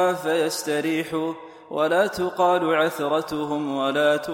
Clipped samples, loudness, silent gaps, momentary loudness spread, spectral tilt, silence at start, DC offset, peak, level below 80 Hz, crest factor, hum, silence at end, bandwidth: under 0.1%; -23 LUFS; none; 7 LU; -4.5 dB/octave; 0 s; under 0.1%; -8 dBFS; -62 dBFS; 14 dB; none; 0 s; 17 kHz